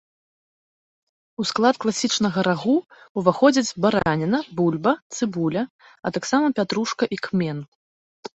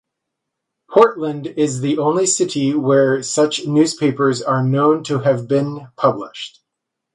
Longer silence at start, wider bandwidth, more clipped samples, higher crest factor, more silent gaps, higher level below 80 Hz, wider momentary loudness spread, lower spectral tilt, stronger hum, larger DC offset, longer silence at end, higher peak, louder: first, 1.4 s vs 0.9 s; second, 8.2 kHz vs 11.5 kHz; neither; about the same, 20 dB vs 16 dB; first, 3.09-3.15 s, 5.02-5.10 s, 5.70-5.79 s, 7.68-8.23 s vs none; first, -58 dBFS vs -64 dBFS; about the same, 10 LU vs 9 LU; about the same, -5 dB/octave vs -5 dB/octave; neither; neither; second, 0.1 s vs 0.65 s; second, -4 dBFS vs 0 dBFS; second, -22 LUFS vs -17 LUFS